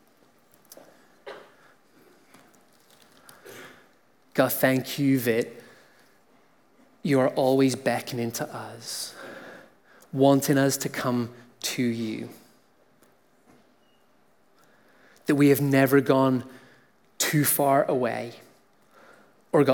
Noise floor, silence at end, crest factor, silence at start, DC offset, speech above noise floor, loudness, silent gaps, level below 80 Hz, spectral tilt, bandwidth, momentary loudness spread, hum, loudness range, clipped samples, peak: -64 dBFS; 0 s; 20 dB; 1.25 s; under 0.1%; 41 dB; -24 LUFS; none; -78 dBFS; -5 dB/octave; 18 kHz; 23 LU; none; 10 LU; under 0.1%; -6 dBFS